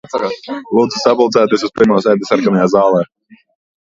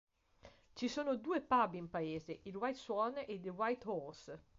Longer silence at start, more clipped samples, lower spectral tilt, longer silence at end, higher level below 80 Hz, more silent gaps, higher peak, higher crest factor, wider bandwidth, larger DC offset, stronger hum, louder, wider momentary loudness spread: second, 0.15 s vs 0.45 s; neither; first, -6 dB/octave vs -4 dB/octave; first, 0.75 s vs 0.2 s; first, -54 dBFS vs -72 dBFS; neither; first, 0 dBFS vs -22 dBFS; about the same, 14 dB vs 18 dB; about the same, 7.8 kHz vs 7.6 kHz; neither; neither; first, -13 LUFS vs -40 LUFS; second, 8 LU vs 12 LU